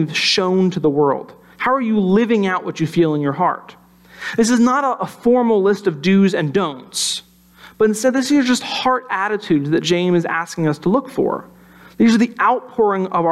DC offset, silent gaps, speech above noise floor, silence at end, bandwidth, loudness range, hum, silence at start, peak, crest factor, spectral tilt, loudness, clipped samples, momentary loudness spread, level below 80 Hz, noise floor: under 0.1%; none; 29 dB; 0 s; 14 kHz; 2 LU; none; 0 s; -4 dBFS; 12 dB; -5 dB/octave; -17 LUFS; under 0.1%; 6 LU; -56 dBFS; -45 dBFS